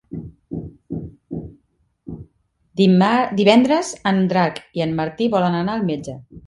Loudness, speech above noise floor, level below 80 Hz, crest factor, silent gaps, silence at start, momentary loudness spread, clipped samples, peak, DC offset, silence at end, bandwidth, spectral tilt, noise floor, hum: -18 LUFS; 46 dB; -50 dBFS; 20 dB; none; 0.1 s; 20 LU; under 0.1%; 0 dBFS; under 0.1%; 0.1 s; 11 kHz; -6 dB/octave; -64 dBFS; none